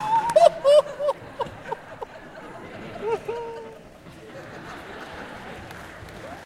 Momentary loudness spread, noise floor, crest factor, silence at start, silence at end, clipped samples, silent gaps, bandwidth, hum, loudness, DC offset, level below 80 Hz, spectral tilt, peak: 23 LU; -45 dBFS; 24 dB; 0 s; 0 s; under 0.1%; none; 14.5 kHz; none; -22 LUFS; under 0.1%; -56 dBFS; -4 dB/octave; -2 dBFS